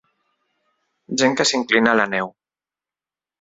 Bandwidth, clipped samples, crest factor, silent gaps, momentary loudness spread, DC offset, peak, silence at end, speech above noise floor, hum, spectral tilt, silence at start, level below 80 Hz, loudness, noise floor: 8 kHz; under 0.1%; 22 dB; none; 10 LU; under 0.1%; 0 dBFS; 1.1 s; over 72 dB; none; -3 dB/octave; 1.1 s; -62 dBFS; -18 LUFS; under -90 dBFS